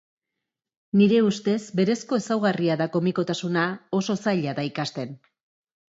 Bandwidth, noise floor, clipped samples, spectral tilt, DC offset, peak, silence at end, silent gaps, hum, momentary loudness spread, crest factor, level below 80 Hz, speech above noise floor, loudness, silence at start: 8 kHz; -85 dBFS; under 0.1%; -6 dB/octave; under 0.1%; -8 dBFS; 0.8 s; none; none; 9 LU; 16 dB; -70 dBFS; 61 dB; -24 LUFS; 0.95 s